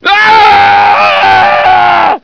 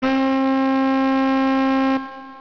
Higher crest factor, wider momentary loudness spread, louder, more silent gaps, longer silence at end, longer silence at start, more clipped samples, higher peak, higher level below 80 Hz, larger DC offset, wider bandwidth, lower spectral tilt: about the same, 6 dB vs 6 dB; about the same, 2 LU vs 3 LU; first, -4 LUFS vs -19 LUFS; neither; about the same, 0.05 s vs 0 s; about the same, 0.05 s vs 0 s; first, 3% vs under 0.1%; first, 0 dBFS vs -12 dBFS; first, -42 dBFS vs -54 dBFS; neither; about the same, 5.4 kHz vs 5.4 kHz; second, -3.5 dB/octave vs -5.5 dB/octave